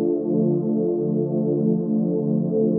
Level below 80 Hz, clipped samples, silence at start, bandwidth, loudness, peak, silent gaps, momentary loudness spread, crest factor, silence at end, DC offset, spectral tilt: -72 dBFS; under 0.1%; 0 s; 1.4 kHz; -22 LUFS; -10 dBFS; none; 1 LU; 12 dB; 0 s; under 0.1%; -16.5 dB/octave